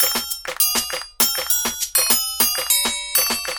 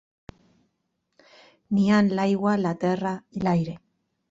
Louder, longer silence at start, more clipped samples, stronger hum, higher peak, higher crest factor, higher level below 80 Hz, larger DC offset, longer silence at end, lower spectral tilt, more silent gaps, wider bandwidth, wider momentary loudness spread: first, -18 LUFS vs -24 LUFS; second, 0 s vs 1.7 s; neither; neither; first, -2 dBFS vs -10 dBFS; about the same, 20 dB vs 16 dB; first, -50 dBFS vs -60 dBFS; neither; second, 0 s vs 0.55 s; second, 1 dB/octave vs -7.5 dB/octave; neither; first, over 20 kHz vs 7.8 kHz; second, 6 LU vs 10 LU